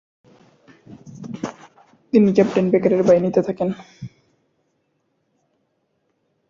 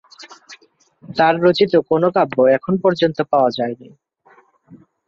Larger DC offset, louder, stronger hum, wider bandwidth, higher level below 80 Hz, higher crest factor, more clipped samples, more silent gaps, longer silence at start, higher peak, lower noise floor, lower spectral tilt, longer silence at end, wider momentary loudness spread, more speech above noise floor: neither; about the same, -18 LUFS vs -16 LUFS; neither; about the same, 7.4 kHz vs 7.2 kHz; about the same, -60 dBFS vs -62 dBFS; about the same, 20 dB vs 16 dB; neither; neither; first, 0.9 s vs 0.2 s; about the same, -2 dBFS vs -2 dBFS; first, -69 dBFS vs -53 dBFS; about the same, -8 dB/octave vs -7 dB/octave; first, 2.4 s vs 0.3 s; first, 23 LU vs 11 LU; first, 52 dB vs 37 dB